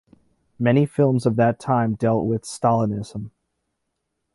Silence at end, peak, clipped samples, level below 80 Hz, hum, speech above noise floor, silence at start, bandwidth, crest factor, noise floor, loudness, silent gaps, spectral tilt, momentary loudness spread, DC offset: 1.05 s; -6 dBFS; under 0.1%; -54 dBFS; none; 57 dB; 0.6 s; 11.5 kHz; 16 dB; -77 dBFS; -21 LUFS; none; -7.5 dB/octave; 11 LU; under 0.1%